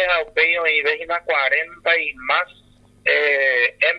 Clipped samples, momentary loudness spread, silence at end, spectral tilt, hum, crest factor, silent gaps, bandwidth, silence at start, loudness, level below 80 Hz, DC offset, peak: under 0.1%; 5 LU; 0 s; -3 dB/octave; 50 Hz at -60 dBFS; 18 dB; none; 10 kHz; 0 s; -18 LUFS; -56 dBFS; under 0.1%; -2 dBFS